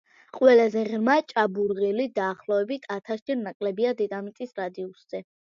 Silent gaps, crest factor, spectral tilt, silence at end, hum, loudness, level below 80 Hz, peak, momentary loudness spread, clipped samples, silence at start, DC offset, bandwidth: 3.22-3.26 s, 3.55-3.60 s; 20 dB; -6.5 dB/octave; 0.2 s; none; -25 LUFS; -76 dBFS; -6 dBFS; 16 LU; under 0.1%; 0.35 s; under 0.1%; 7.2 kHz